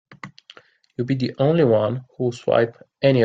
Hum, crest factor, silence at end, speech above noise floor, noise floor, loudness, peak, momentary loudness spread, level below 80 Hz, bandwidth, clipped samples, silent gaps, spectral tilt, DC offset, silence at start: none; 18 dB; 0 s; 30 dB; -50 dBFS; -21 LUFS; -2 dBFS; 21 LU; -60 dBFS; 7.8 kHz; under 0.1%; none; -8 dB/octave; under 0.1%; 0.25 s